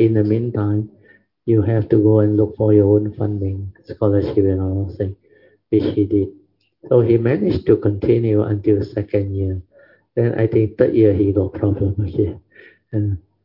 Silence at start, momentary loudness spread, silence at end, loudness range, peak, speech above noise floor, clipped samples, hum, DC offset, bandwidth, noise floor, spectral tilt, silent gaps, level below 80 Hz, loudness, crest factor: 0 s; 11 LU; 0.25 s; 3 LU; 0 dBFS; 37 dB; under 0.1%; none; under 0.1%; 5.6 kHz; -53 dBFS; -12 dB/octave; none; -48 dBFS; -18 LUFS; 18 dB